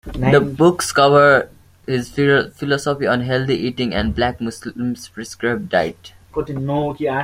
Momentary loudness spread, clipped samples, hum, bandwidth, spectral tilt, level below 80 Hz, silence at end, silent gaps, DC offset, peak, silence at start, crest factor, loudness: 14 LU; under 0.1%; none; 16 kHz; -5.5 dB/octave; -40 dBFS; 0 s; none; under 0.1%; -2 dBFS; 0.05 s; 16 dB; -18 LUFS